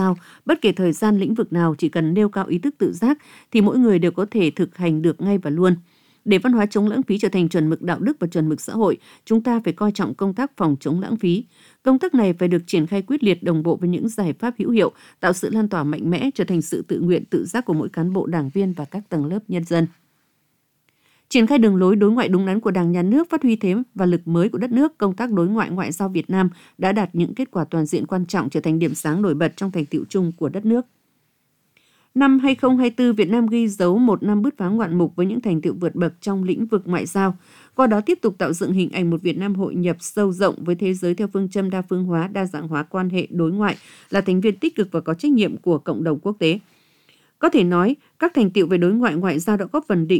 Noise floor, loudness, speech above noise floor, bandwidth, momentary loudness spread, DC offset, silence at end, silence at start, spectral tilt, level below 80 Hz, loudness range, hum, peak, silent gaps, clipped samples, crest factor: -67 dBFS; -20 LUFS; 48 dB; 16.5 kHz; 6 LU; under 0.1%; 0 s; 0 s; -7 dB/octave; -62 dBFS; 4 LU; none; -4 dBFS; none; under 0.1%; 16 dB